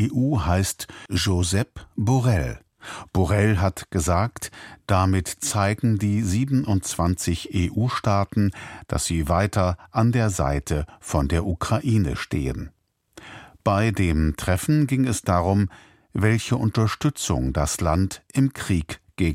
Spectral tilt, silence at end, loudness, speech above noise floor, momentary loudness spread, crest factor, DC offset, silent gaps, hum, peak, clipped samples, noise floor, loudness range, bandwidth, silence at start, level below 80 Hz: -5.5 dB/octave; 0 s; -23 LUFS; 28 dB; 8 LU; 18 dB; under 0.1%; none; none; -4 dBFS; under 0.1%; -50 dBFS; 2 LU; 16 kHz; 0 s; -36 dBFS